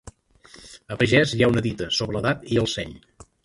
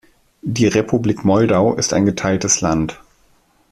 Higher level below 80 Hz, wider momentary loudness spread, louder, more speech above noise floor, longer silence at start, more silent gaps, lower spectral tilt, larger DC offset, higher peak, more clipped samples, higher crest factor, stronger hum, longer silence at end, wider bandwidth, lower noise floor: about the same, -48 dBFS vs -44 dBFS; first, 18 LU vs 8 LU; second, -22 LUFS vs -16 LUFS; second, 29 dB vs 40 dB; second, 0.05 s vs 0.45 s; neither; about the same, -5 dB/octave vs -5 dB/octave; neither; about the same, -4 dBFS vs -2 dBFS; neither; about the same, 20 dB vs 16 dB; neither; second, 0.45 s vs 0.75 s; second, 11.5 kHz vs 14 kHz; second, -51 dBFS vs -56 dBFS